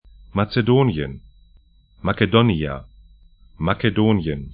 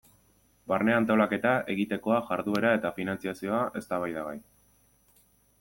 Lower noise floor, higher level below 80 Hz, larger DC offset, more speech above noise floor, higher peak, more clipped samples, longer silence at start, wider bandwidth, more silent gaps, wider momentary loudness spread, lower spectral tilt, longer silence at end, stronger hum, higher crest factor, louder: second, -53 dBFS vs -65 dBFS; first, -42 dBFS vs -66 dBFS; neither; about the same, 34 dB vs 37 dB; first, 0 dBFS vs -10 dBFS; neither; second, 0.35 s vs 0.7 s; second, 5.2 kHz vs 17 kHz; neither; about the same, 12 LU vs 10 LU; first, -12 dB/octave vs -6.5 dB/octave; second, 0 s vs 1.2 s; second, none vs 50 Hz at -55 dBFS; about the same, 20 dB vs 20 dB; first, -20 LUFS vs -28 LUFS